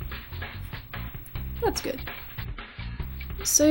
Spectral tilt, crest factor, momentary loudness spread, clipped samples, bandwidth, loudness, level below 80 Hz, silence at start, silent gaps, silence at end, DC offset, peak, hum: -3.5 dB/octave; 22 dB; 12 LU; under 0.1%; 18 kHz; -31 LUFS; -40 dBFS; 0 s; none; 0 s; under 0.1%; -8 dBFS; none